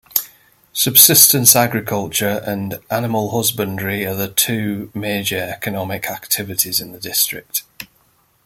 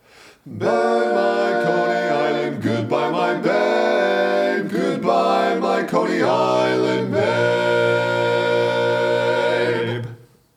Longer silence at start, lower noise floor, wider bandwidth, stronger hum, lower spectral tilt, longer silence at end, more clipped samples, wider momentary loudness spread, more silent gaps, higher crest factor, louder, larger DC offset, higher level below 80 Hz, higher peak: second, 0.15 s vs 0.45 s; first, -58 dBFS vs -40 dBFS; first, 17 kHz vs 15 kHz; neither; second, -2.5 dB/octave vs -6 dB/octave; first, 0.6 s vs 0.4 s; first, 0.1% vs under 0.1%; first, 16 LU vs 4 LU; neither; about the same, 18 dB vs 16 dB; first, -15 LUFS vs -19 LUFS; neither; first, -56 dBFS vs -70 dBFS; first, 0 dBFS vs -4 dBFS